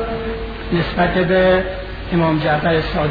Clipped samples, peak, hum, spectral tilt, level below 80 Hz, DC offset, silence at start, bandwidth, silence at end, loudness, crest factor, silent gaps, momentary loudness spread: under 0.1%; -4 dBFS; none; -9 dB/octave; -30 dBFS; under 0.1%; 0 s; 5 kHz; 0 s; -17 LUFS; 14 dB; none; 11 LU